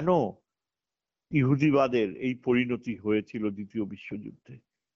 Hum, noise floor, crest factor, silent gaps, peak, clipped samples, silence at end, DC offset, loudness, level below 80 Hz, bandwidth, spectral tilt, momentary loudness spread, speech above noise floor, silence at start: none; under -90 dBFS; 18 dB; none; -12 dBFS; under 0.1%; 0.4 s; under 0.1%; -28 LUFS; -64 dBFS; 7.2 kHz; -6.5 dB/octave; 14 LU; over 63 dB; 0 s